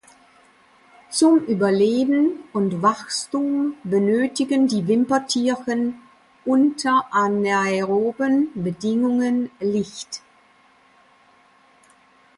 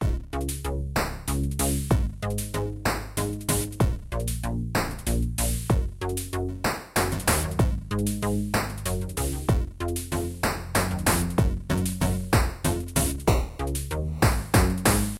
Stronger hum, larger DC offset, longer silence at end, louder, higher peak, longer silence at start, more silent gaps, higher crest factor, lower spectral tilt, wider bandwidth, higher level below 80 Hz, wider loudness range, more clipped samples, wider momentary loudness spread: neither; neither; first, 2.2 s vs 0 s; first, -21 LUFS vs -27 LUFS; about the same, -6 dBFS vs -8 dBFS; first, 1.1 s vs 0 s; neither; about the same, 16 dB vs 18 dB; about the same, -5 dB/octave vs -5 dB/octave; second, 11.5 kHz vs 16.5 kHz; second, -66 dBFS vs -32 dBFS; about the same, 5 LU vs 3 LU; neither; about the same, 8 LU vs 7 LU